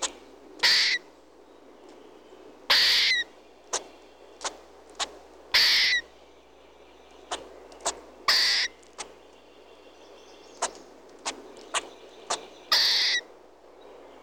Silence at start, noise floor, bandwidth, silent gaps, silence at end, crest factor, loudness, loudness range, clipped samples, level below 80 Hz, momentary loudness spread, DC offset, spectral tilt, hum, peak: 0 s; -54 dBFS; over 20 kHz; none; 1 s; 20 dB; -24 LUFS; 11 LU; under 0.1%; -64 dBFS; 19 LU; under 0.1%; 1.5 dB/octave; 60 Hz at -65 dBFS; -10 dBFS